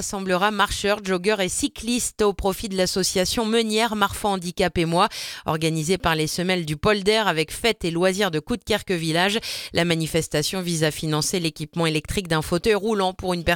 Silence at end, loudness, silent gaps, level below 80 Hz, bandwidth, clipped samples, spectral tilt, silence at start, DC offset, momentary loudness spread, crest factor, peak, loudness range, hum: 0 s; -22 LUFS; none; -44 dBFS; 19 kHz; under 0.1%; -4 dB/octave; 0 s; under 0.1%; 4 LU; 18 dB; -4 dBFS; 1 LU; none